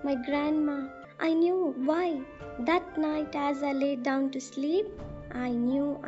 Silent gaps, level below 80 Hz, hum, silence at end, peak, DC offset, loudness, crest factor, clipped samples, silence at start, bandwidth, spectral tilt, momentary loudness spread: none; -56 dBFS; none; 0 s; -12 dBFS; under 0.1%; -29 LUFS; 16 dB; under 0.1%; 0 s; 8 kHz; -4 dB/octave; 10 LU